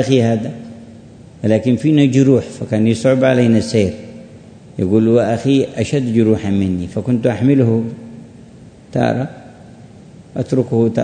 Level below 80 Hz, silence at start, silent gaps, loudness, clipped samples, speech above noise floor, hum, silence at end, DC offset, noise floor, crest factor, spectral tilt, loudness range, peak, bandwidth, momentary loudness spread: -50 dBFS; 0 s; none; -15 LUFS; under 0.1%; 26 dB; none; 0 s; under 0.1%; -40 dBFS; 16 dB; -7.5 dB/octave; 5 LU; 0 dBFS; 9.6 kHz; 15 LU